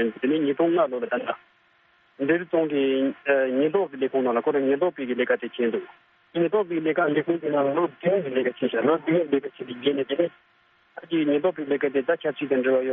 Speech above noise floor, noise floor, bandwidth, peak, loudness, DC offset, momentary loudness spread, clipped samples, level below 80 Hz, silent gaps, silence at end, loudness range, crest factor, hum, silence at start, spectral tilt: 38 dB; -61 dBFS; 3.9 kHz; -8 dBFS; -24 LUFS; under 0.1%; 6 LU; under 0.1%; -72 dBFS; none; 0 s; 2 LU; 16 dB; none; 0 s; -4 dB/octave